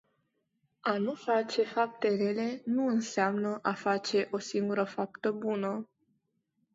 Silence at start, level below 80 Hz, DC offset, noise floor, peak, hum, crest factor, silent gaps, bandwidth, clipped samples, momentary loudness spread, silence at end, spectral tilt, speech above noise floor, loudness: 0.85 s; -80 dBFS; under 0.1%; -78 dBFS; -14 dBFS; none; 18 dB; none; 8 kHz; under 0.1%; 4 LU; 0.9 s; -5 dB/octave; 47 dB; -31 LUFS